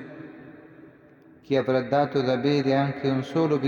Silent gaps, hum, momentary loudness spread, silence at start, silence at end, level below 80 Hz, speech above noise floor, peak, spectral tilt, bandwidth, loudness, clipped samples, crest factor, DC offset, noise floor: none; none; 20 LU; 0 s; 0 s; -66 dBFS; 29 dB; -8 dBFS; -7.5 dB/octave; 7.2 kHz; -24 LUFS; under 0.1%; 16 dB; under 0.1%; -53 dBFS